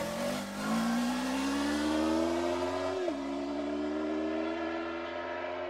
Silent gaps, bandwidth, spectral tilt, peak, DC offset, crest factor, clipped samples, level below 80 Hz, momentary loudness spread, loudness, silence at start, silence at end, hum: none; 16 kHz; -4.5 dB/octave; -18 dBFS; under 0.1%; 14 dB; under 0.1%; -58 dBFS; 6 LU; -33 LUFS; 0 s; 0 s; none